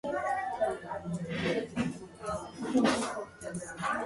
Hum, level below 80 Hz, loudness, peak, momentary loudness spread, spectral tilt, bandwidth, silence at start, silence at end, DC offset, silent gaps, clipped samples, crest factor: none; -60 dBFS; -34 LUFS; -14 dBFS; 12 LU; -5 dB/octave; 11.5 kHz; 0.05 s; 0 s; under 0.1%; none; under 0.1%; 18 dB